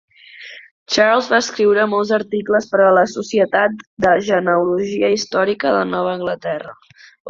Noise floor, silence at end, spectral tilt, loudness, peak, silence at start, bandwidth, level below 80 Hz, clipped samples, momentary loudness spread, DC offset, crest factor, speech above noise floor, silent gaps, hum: -38 dBFS; 0 s; -4.5 dB/octave; -16 LUFS; -2 dBFS; 0.35 s; 7.6 kHz; -58 dBFS; under 0.1%; 11 LU; under 0.1%; 16 dB; 22 dB; 0.71-0.86 s, 3.87-3.97 s, 7.20-7.25 s; none